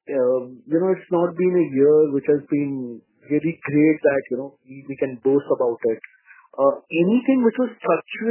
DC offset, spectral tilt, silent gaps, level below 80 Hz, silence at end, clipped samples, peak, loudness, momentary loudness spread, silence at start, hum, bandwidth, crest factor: under 0.1%; -11.5 dB/octave; none; -70 dBFS; 0 s; under 0.1%; -4 dBFS; -21 LUFS; 12 LU; 0.1 s; none; 3.2 kHz; 16 dB